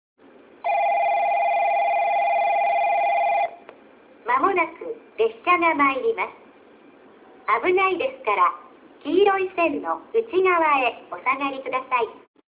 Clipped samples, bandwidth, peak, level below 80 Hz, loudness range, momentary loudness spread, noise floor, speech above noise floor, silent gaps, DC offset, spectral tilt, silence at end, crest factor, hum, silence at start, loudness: under 0.1%; 4 kHz; -6 dBFS; -68 dBFS; 2 LU; 9 LU; -50 dBFS; 28 dB; none; under 0.1%; -7 dB/octave; 0.35 s; 16 dB; none; 0.65 s; -22 LUFS